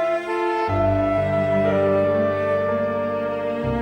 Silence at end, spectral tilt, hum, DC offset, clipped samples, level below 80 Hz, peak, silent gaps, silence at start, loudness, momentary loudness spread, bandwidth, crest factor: 0 s; -8 dB/octave; none; under 0.1%; under 0.1%; -42 dBFS; -8 dBFS; none; 0 s; -21 LUFS; 5 LU; 9.8 kHz; 12 dB